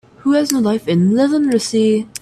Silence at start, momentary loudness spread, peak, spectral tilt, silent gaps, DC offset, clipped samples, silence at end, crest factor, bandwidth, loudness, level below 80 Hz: 0.25 s; 3 LU; 0 dBFS; -5.5 dB/octave; none; under 0.1%; under 0.1%; 0.05 s; 14 dB; 14.5 kHz; -15 LUFS; -58 dBFS